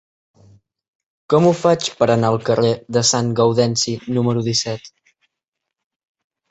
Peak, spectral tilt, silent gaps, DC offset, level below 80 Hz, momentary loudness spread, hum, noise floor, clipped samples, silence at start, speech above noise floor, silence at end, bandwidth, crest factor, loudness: -2 dBFS; -4.5 dB/octave; none; under 0.1%; -56 dBFS; 5 LU; none; -81 dBFS; under 0.1%; 1.3 s; 64 dB; 1.65 s; 8.2 kHz; 18 dB; -17 LUFS